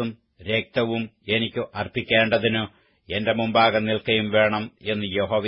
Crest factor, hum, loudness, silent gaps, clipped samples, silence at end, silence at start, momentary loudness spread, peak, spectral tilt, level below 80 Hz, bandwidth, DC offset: 18 dB; none; -23 LUFS; none; under 0.1%; 0 s; 0 s; 10 LU; -6 dBFS; -10 dB/octave; -56 dBFS; 5.8 kHz; under 0.1%